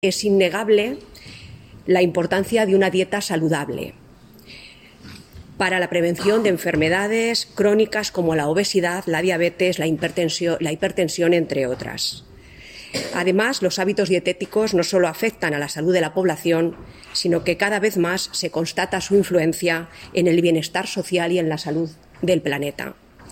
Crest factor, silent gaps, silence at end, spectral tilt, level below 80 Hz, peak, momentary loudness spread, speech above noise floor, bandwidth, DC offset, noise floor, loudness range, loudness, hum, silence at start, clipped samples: 16 dB; none; 0 s; -4.5 dB/octave; -54 dBFS; -4 dBFS; 10 LU; 26 dB; 16.5 kHz; under 0.1%; -46 dBFS; 3 LU; -20 LUFS; none; 0.05 s; under 0.1%